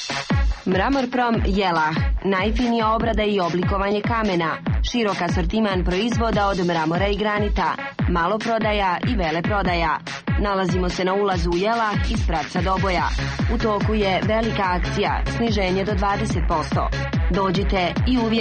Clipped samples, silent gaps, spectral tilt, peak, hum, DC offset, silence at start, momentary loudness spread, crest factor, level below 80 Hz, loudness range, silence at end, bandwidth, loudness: under 0.1%; none; -6 dB/octave; -8 dBFS; none; under 0.1%; 0 s; 3 LU; 12 dB; -28 dBFS; 1 LU; 0 s; 8.8 kHz; -21 LUFS